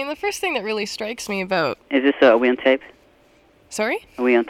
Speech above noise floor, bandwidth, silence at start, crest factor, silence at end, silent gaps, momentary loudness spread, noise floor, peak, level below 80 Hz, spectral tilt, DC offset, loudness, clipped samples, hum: 35 dB; 16 kHz; 0 s; 18 dB; 0 s; none; 11 LU; -55 dBFS; -4 dBFS; -60 dBFS; -4 dB/octave; under 0.1%; -20 LUFS; under 0.1%; none